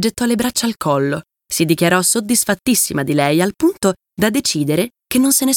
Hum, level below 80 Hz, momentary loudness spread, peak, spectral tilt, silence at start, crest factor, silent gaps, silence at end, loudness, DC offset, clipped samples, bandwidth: none; -50 dBFS; 6 LU; 0 dBFS; -3.5 dB/octave; 0 s; 16 dB; none; 0 s; -16 LUFS; under 0.1%; under 0.1%; 19 kHz